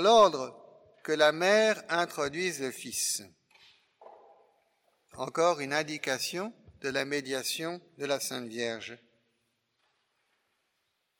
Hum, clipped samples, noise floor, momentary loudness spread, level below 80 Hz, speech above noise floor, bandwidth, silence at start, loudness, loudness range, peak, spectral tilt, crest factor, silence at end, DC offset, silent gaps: none; under 0.1%; -79 dBFS; 15 LU; -72 dBFS; 50 dB; 17 kHz; 0 s; -30 LUFS; 7 LU; -10 dBFS; -2.5 dB/octave; 22 dB; 2.25 s; under 0.1%; none